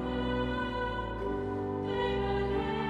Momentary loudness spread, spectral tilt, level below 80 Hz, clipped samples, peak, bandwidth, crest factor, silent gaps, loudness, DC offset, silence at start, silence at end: 4 LU; -7.5 dB/octave; -42 dBFS; under 0.1%; -20 dBFS; 8.4 kHz; 12 dB; none; -33 LUFS; under 0.1%; 0 s; 0 s